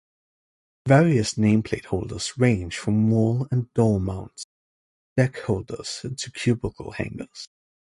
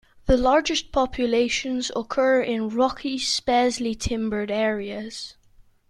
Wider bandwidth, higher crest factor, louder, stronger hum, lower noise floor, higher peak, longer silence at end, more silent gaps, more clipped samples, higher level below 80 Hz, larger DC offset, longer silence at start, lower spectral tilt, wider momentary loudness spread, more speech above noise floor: about the same, 11.5 kHz vs 12 kHz; about the same, 20 dB vs 18 dB; about the same, -23 LUFS vs -23 LUFS; neither; first, under -90 dBFS vs -55 dBFS; about the same, -4 dBFS vs -4 dBFS; second, 0.35 s vs 0.6 s; first, 4.44-5.16 s vs none; neither; second, -46 dBFS vs -40 dBFS; neither; first, 0.85 s vs 0.25 s; first, -6.5 dB/octave vs -3.5 dB/octave; first, 16 LU vs 9 LU; first, over 67 dB vs 32 dB